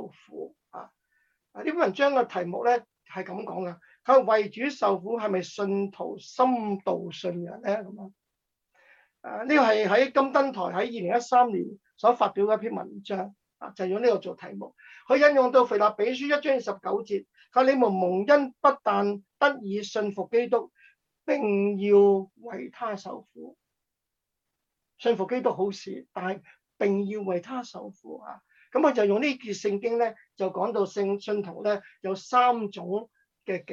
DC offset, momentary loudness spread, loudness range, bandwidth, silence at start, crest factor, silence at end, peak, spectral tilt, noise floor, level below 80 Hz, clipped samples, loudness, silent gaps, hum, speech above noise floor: under 0.1%; 18 LU; 7 LU; 7.6 kHz; 0 s; 20 dB; 0 s; -6 dBFS; -5.5 dB/octave; -85 dBFS; -78 dBFS; under 0.1%; -26 LUFS; none; none; 59 dB